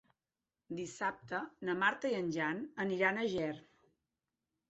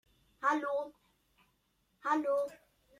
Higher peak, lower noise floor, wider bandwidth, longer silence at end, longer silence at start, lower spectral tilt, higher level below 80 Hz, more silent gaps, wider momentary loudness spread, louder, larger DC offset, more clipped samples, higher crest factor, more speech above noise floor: about the same, -18 dBFS vs -18 dBFS; first, under -90 dBFS vs -76 dBFS; second, 8 kHz vs 14 kHz; first, 1.1 s vs 0.45 s; first, 0.7 s vs 0.4 s; about the same, -3.5 dB/octave vs -4 dB/octave; about the same, -76 dBFS vs -78 dBFS; neither; about the same, 11 LU vs 10 LU; about the same, -36 LUFS vs -34 LUFS; neither; neither; about the same, 22 dB vs 20 dB; first, over 54 dB vs 42 dB